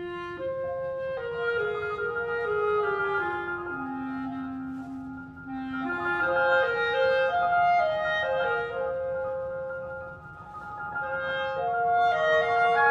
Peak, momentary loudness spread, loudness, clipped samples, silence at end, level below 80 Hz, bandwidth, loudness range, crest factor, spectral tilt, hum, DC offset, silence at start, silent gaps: -10 dBFS; 14 LU; -27 LUFS; under 0.1%; 0 s; -58 dBFS; 7.6 kHz; 7 LU; 16 dB; -6 dB/octave; none; under 0.1%; 0 s; none